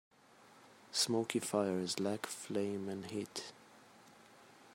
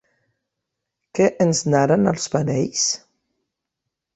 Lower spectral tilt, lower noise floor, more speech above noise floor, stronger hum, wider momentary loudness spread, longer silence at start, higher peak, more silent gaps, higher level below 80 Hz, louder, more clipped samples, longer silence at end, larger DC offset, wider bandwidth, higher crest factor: about the same, -3.5 dB/octave vs -4.5 dB/octave; second, -63 dBFS vs -82 dBFS; second, 25 dB vs 63 dB; neither; first, 9 LU vs 5 LU; second, 0.4 s vs 1.15 s; second, -16 dBFS vs -2 dBFS; neither; second, -84 dBFS vs -58 dBFS; second, -38 LUFS vs -19 LUFS; neither; second, 0 s vs 1.2 s; neither; first, 16 kHz vs 8.4 kHz; about the same, 24 dB vs 20 dB